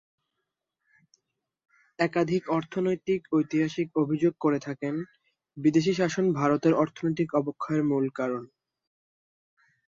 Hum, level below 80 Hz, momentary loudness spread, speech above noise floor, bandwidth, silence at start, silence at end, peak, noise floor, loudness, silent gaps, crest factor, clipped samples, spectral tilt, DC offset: none; -70 dBFS; 8 LU; 58 dB; 7.6 kHz; 2 s; 1.55 s; -10 dBFS; -84 dBFS; -27 LUFS; none; 18 dB; under 0.1%; -7 dB/octave; under 0.1%